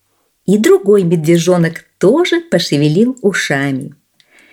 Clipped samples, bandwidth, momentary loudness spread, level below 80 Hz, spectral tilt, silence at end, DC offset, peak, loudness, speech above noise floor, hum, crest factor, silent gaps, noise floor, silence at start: under 0.1%; 17 kHz; 8 LU; -60 dBFS; -5.5 dB/octave; 0.6 s; under 0.1%; 0 dBFS; -12 LUFS; 38 dB; none; 12 dB; none; -49 dBFS; 0.5 s